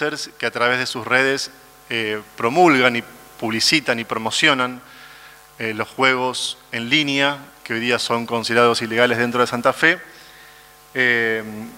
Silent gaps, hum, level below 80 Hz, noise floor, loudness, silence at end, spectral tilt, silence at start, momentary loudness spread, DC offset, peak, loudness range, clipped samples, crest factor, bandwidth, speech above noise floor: none; none; -62 dBFS; -46 dBFS; -19 LUFS; 0 s; -3 dB/octave; 0 s; 10 LU; under 0.1%; 0 dBFS; 2 LU; under 0.1%; 20 dB; 16 kHz; 26 dB